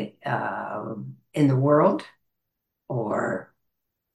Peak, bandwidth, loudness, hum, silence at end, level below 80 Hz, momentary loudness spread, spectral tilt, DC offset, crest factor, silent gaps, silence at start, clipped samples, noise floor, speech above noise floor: -8 dBFS; 12 kHz; -25 LUFS; none; 0.7 s; -70 dBFS; 15 LU; -8.5 dB/octave; under 0.1%; 18 dB; none; 0 s; under 0.1%; -81 dBFS; 57 dB